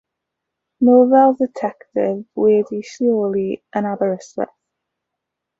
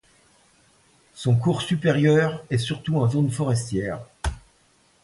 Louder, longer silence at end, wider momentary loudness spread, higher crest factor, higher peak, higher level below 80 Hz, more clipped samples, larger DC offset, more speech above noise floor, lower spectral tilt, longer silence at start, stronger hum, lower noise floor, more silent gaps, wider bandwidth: first, -17 LUFS vs -23 LUFS; first, 1.15 s vs 0.65 s; about the same, 14 LU vs 13 LU; about the same, 16 dB vs 18 dB; first, -2 dBFS vs -6 dBFS; second, -64 dBFS vs -42 dBFS; neither; neither; first, 64 dB vs 39 dB; about the same, -7.5 dB/octave vs -6.5 dB/octave; second, 0.8 s vs 1.15 s; neither; first, -81 dBFS vs -61 dBFS; neither; second, 7.6 kHz vs 11.5 kHz